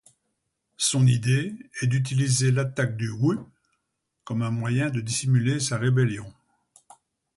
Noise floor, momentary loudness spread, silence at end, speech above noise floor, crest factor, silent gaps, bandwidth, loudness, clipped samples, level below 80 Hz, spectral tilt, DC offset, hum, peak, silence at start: -79 dBFS; 8 LU; 1.05 s; 55 dB; 16 dB; none; 11.5 kHz; -24 LUFS; under 0.1%; -58 dBFS; -5 dB/octave; under 0.1%; none; -10 dBFS; 0.8 s